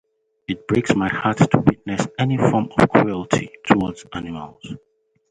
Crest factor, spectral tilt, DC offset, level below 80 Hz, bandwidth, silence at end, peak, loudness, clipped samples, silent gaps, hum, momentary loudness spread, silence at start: 20 dB; -6.5 dB/octave; under 0.1%; -48 dBFS; 11 kHz; 0.55 s; 0 dBFS; -19 LUFS; under 0.1%; none; none; 18 LU; 0.5 s